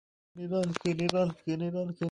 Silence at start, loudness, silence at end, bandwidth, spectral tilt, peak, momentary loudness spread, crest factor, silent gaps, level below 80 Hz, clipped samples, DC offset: 0.35 s; -31 LUFS; 0 s; 11.5 kHz; -6.5 dB/octave; -6 dBFS; 5 LU; 26 dB; none; -66 dBFS; under 0.1%; under 0.1%